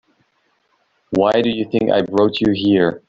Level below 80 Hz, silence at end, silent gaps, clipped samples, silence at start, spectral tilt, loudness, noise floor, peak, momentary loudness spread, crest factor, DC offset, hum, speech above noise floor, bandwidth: -52 dBFS; 0.1 s; none; under 0.1%; 1.1 s; -7 dB/octave; -17 LUFS; -64 dBFS; -2 dBFS; 4 LU; 16 dB; under 0.1%; none; 48 dB; 7.4 kHz